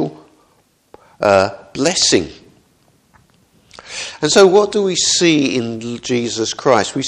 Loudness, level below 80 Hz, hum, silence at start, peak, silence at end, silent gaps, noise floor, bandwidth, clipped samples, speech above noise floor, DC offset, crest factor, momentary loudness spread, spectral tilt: -14 LUFS; -52 dBFS; none; 0 s; 0 dBFS; 0 s; none; -57 dBFS; 11.5 kHz; under 0.1%; 43 dB; under 0.1%; 16 dB; 14 LU; -3 dB/octave